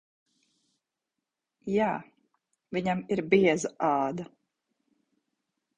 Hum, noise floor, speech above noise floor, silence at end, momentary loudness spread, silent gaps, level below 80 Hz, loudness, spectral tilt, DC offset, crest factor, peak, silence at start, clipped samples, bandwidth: none; -87 dBFS; 60 dB; 1.5 s; 16 LU; none; -68 dBFS; -28 LUFS; -5.5 dB/octave; under 0.1%; 24 dB; -8 dBFS; 1.65 s; under 0.1%; 10 kHz